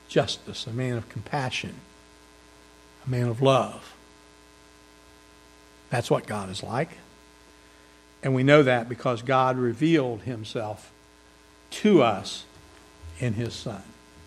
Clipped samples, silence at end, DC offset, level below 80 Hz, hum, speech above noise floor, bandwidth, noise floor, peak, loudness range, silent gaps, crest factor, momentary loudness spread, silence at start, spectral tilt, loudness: under 0.1%; 0.05 s; under 0.1%; -60 dBFS; none; 30 dB; 13.5 kHz; -54 dBFS; -2 dBFS; 9 LU; none; 26 dB; 19 LU; 0.1 s; -6 dB/octave; -25 LUFS